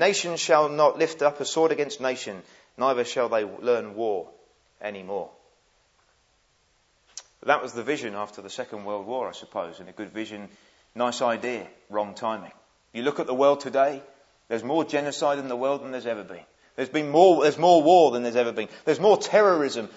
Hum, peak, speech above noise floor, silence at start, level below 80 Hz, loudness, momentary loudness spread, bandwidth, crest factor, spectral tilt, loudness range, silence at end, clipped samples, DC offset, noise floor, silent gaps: none; -4 dBFS; 42 dB; 0 s; -76 dBFS; -24 LUFS; 18 LU; 8 kHz; 22 dB; -4 dB/octave; 12 LU; 0.05 s; under 0.1%; under 0.1%; -66 dBFS; none